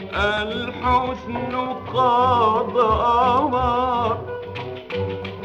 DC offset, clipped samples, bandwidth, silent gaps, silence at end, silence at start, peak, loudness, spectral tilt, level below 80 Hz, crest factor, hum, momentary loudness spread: under 0.1%; under 0.1%; 8.8 kHz; none; 0 s; 0 s; -6 dBFS; -20 LUFS; -6.5 dB/octave; -40 dBFS; 14 dB; none; 11 LU